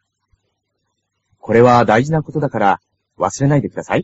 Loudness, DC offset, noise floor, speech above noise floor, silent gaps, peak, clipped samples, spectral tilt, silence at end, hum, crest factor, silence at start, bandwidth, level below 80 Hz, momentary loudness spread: -15 LUFS; under 0.1%; -72 dBFS; 58 dB; none; 0 dBFS; under 0.1%; -6.5 dB/octave; 0 s; none; 16 dB; 1.45 s; 8 kHz; -48 dBFS; 11 LU